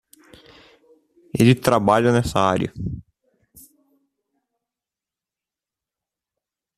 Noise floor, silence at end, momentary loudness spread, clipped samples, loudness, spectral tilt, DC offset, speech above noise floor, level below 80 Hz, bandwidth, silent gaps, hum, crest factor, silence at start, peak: -89 dBFS; 3.8 s; 15 LU; under 0.1%; -19 LUFS; -6.5 dB/octave; under 0.1%; 71 dB; -48 dBFS; 14.5 kHz; none; none; 22 dB; 1.35 s; -2 dBFS